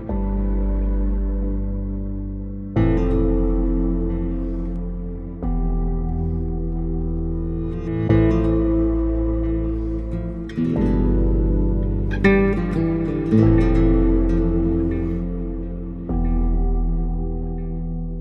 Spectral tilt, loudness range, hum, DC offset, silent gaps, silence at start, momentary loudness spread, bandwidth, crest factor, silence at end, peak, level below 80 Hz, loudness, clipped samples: -10.5 dB/octave; 7 LU; none; under 0.1%; none; 0 s; 11 LU; 4.2 kHz; 18 dB; 0 s; -2 dBFS; -24 dBFS; -22 LUFS; under 0.1%